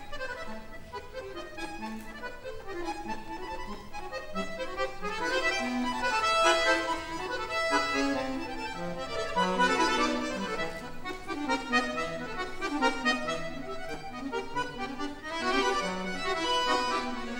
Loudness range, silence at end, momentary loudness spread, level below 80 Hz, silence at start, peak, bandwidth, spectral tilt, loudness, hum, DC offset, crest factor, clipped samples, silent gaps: 11 LU; 0 s; 14 LU; -46 dBFS; 0 s; -12 dBFS; 17 kHz; -3 dB/octave; -31 LUFS; none; under 0.1%; 20 dB; under 0.1%; none